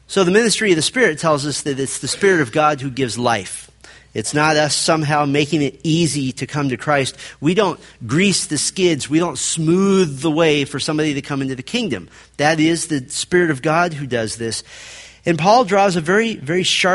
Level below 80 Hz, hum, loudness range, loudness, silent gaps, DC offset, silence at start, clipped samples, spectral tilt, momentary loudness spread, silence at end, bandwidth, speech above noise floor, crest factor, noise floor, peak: -52 dBFS; none; 2 LU; -17 LUFS; none; under 0.1%; 0.1 s; under 0.1%; -4 dB/octave; 9 LU; 0 s; 11.5 kHz; 27 dB; 18 dB; -45 dBFS; 0 dBFS